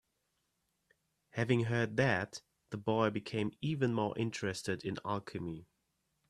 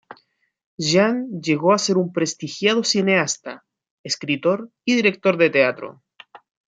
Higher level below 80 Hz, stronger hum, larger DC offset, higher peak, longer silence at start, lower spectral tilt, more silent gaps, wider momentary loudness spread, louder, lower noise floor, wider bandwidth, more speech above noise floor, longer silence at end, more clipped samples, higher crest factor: about the same, -70 dBFS vs -68 dBFS; neither; neither; second, -16 dBFS vs -2 dBFS; first, 1.35 s vs 0.1 s; first, -6 dB/octave vs -4 dB/octave; second, none vs 0.66-0.78 s, 3.91-4.04 s; first, 13 LU vs 10 LU; second, -35 LUFS vs -20 LUFS; first, -82 dBFS vs -62 dBFS; first, 12.5 kHz vs 9.4 kHz; first, 47 dB vs 42 dB; first, 0.65 s vs 0.35 s; neither; about the same, 22 dB vs 20 dB